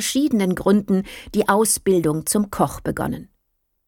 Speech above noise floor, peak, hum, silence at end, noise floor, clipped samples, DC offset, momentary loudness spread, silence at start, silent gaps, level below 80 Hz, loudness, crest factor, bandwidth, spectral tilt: 52 dB; -4 dBFS; none; 0.6 s; -71 dBFS; under 0.1%; under 0.1%; 9 LU; 0 s; none; -46 dBFS; -20 LUFS; 16 dB; 18 kHz; -4.5 dB/octave